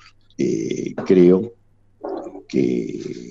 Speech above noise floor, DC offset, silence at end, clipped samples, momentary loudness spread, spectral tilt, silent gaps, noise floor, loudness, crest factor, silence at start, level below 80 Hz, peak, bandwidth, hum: 21 dB; under 0.1%; 0 s; under 0.1%; 18 LU; -7.5 dB/octave; none; -38 dBFS; -19 LUFS; 18 dB; 0.4 s; -56 dBFS; -2 dBFS; 7.4 kHz; none